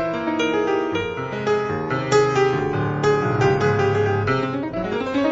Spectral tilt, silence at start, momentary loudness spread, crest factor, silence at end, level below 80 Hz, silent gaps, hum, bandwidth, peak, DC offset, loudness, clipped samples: -6 dB/octave; 0 s; 7 LU; 16 dB; 0 s; -48 dBFS; none; none; 7.8 kHz; -4 dBFS; under 0.1%; -21 LUFS; under 0.1%